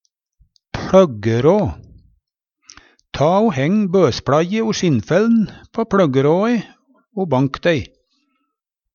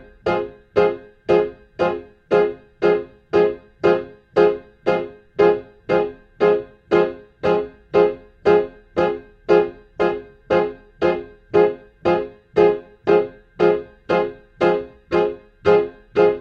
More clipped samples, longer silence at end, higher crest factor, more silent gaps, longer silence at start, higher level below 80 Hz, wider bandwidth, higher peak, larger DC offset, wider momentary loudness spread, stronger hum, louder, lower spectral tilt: neither; first, 1.1 s vs 0 s; about the same, 18 dB vs 18 dB; neither; first, 0.75 s vs 0.25 s; first, -46 dBFS vs -52 dBFS; about the same, 7.2 kHz vs 6.6 kHz; about the same, 0 dBFS vs -2 dBFS; neither; about the same, 10 LU vs 8 LU; neither; first, -16 LUFS vs -20 LUFS; about the same, -6.5 dB/octave vs -7.5 dB/octave